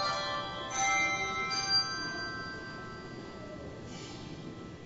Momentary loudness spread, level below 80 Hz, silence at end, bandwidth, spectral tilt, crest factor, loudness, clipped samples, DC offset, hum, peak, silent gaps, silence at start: 17 LU; -58 dBFS; 0 s; 8 kHz; -2 dB/octave; 16 dB; -32 LUFS; under 0.1%; under 0.1%; none; -18 dBFS; none; 0 s